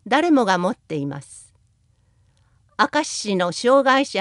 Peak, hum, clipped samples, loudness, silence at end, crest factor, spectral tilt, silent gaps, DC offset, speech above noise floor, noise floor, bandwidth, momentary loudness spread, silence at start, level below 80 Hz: -2 dBFS; 60 Hz at -55 dBFS; under 0.1%; -20 LUFS; 0 s; 20 dB; -4 dB/octave; none; under 0.1%; 42 dB; -61 dBFS; 11.5 kHz; 13 LU; 0.05 s; -66 dBFS